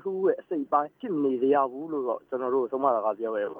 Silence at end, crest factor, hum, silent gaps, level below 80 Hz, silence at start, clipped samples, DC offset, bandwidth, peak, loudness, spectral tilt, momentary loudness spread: 0 s; 18 dB; none; none; -82 dBFS; 0.05 s; under 0.1%; under 0.1%; 3.6 kHz; -10 dBFS; -27 LUFS; -9 dB/octave; 7 LU